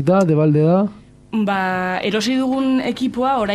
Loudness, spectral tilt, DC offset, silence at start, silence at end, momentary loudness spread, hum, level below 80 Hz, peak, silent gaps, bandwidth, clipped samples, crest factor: -18 LUFS; -6.5 dB/octave; under 0.1%; 0 s; 0 s; 7 LU; none; -52 dBFS; -4 dBFS; none; 13 kHz; under 0.1%; 12 dB